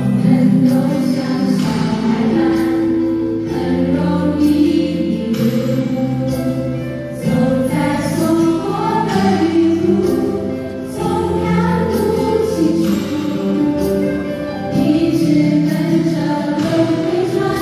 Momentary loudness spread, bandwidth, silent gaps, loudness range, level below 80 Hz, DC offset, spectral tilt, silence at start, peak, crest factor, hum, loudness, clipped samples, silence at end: 6 LU; 15 kHz; none; 2 LU; -38 dBFS; under 0.1%; -7 dB/octave; 0 s; -2 dBFS; 14 dB; none; -16 LUFS; under 0.1%; 0 s